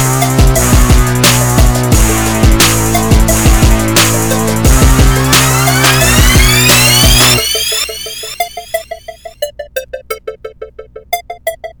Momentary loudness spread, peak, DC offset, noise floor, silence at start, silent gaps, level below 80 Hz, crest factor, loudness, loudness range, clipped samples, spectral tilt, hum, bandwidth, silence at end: 17 LU; 0 dBFS; under 0.1%; -30 dBFS; 0 s; none; -14 dBFS; 10 dB; -8 LUFS; 15 LU; under 0.1%; -3.5 dB/octave; 60 Hz at -30 dBFS; over 20 kHz; 0.1 s